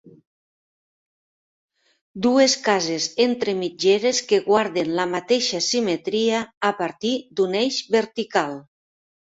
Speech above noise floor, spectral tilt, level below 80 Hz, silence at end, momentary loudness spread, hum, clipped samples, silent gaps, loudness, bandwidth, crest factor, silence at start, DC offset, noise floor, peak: over 69 dB; -3 dB/octave; -66 dBFS; 0.75 s; 7 LU; none; under 0.1%; 0.27-1.69 s, 2.01-2.14 s, 6.57-6.61 s; -21 LUFS; 8 kHz; 18 dB; 0.05 s; under 0.1%; under -90 dBFS; -4 dBFS